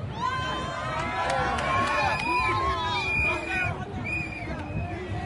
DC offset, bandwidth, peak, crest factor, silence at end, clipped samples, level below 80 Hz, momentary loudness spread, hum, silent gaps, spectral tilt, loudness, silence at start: under 0.1%; 11.5 kHz; -12 dBFS; 16 dB; 0 s; under 0.1%; -42 dBFS; 9 LU; none; none; -5 dB/octave; -27 LUFS; 0 s